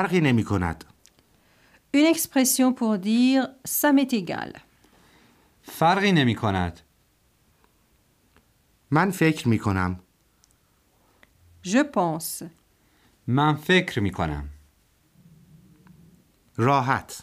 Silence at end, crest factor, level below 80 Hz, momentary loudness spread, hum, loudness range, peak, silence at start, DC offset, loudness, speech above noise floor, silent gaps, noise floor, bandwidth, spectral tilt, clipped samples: 0 s; 20 dB; -50 dBFS; 16 LU; none; 6 LU; -6 dBFS; 0 s; under 0.1%; -23 LUFS; 42 dB; none; -64 dBFS; 15.5 kHz; -5 dB/octave; under 0.1%